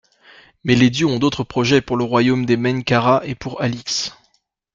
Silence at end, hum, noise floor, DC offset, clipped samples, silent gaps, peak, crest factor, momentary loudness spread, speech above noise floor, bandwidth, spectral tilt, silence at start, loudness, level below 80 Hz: 0.65 s; none; -64 dBFS; under 0.1%; under 0.1%; none; -2 dBFS; 16 dB; 8 LU; 47 dB; 7.6 kHz; -5.5 dB/octave; 0.65 s; -18 LUFS; -50 dBFS